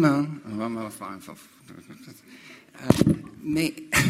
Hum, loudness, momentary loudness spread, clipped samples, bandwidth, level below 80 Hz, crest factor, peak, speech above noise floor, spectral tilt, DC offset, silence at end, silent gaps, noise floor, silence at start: none; -26 LUFS; 25 LU; under 0.1%; 16 kHz; -50 dBFS; 26 dB; 0 dBFS; 23 dB; -5.5 dB/octave; under 0.1%; 0 s; none; -48 dBFS; 0 s